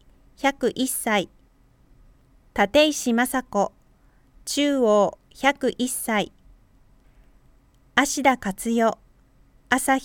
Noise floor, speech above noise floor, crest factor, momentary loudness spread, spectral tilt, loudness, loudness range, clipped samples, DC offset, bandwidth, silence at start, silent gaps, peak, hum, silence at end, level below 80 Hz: -57 dBFS; 36 dB; 22 dB; 8 LU; -3 dB/octave; -23 LUFS; 3 LU; under 0.1%; under 0.1%; 19 kHz; 0.4 s; none; -2 dBFS; none; 0 s; -54 dBFS